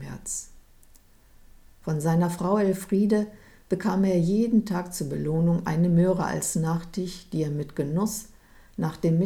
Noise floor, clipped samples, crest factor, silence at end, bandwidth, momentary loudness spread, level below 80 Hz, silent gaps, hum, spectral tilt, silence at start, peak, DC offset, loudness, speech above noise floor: -54 dBFS; under 0.1%; 14 dB; 0 s; 16 kHz; 10 LU; -50 dBFS; none; none; -6.5 dB/octave; 0 s; -10 dBFS; under 0.1%; -26 LUFS; 30 dB